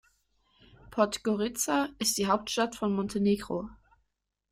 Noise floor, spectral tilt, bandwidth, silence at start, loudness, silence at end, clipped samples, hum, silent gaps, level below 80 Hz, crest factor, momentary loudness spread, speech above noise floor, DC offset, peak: -81 dBFS; -4 dB/octave; 16 kHz; 0.9 s; -29 LUFS; 0.75 s; under 0.1%; none; none; -60 dBFS; 22 dB; 9 LU; 52 dB; under 0.1%; -10 dBFS